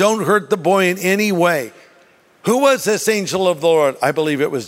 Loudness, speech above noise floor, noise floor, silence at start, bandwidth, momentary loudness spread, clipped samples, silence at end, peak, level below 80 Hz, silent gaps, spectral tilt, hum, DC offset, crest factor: -16 LUFS; 35 dB; -51 dBFS; 0 s; 16 kHz; 4 LU; under 0.1%; 0 s; -2 dBFS; -66 dBFS; none; -4 dB/octave; none; under 0.1%; 16 dB